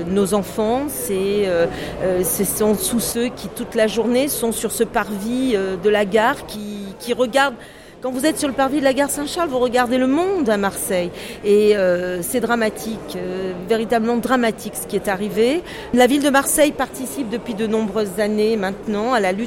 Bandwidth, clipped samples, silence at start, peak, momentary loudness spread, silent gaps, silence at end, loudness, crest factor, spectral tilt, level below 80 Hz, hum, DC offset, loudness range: 16.5 kHz; under 0.1%; 0 s; -4 dBFS; 9 LU; none; 0 s; -19 LUFS; 16 dB; -4 dB/octave; -46 dBFS; none; under 0.1%; 2 LU